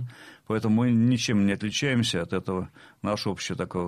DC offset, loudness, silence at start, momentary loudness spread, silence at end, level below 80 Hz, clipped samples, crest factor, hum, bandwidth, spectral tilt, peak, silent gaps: under 0.1%; -26 LUFS; 0 s; 11 LU; 0 s; -60 dBFS; under 0.1%; 14 dB; none; 13.5 kHz; -5.5 dB/octave; -12 dBFS; none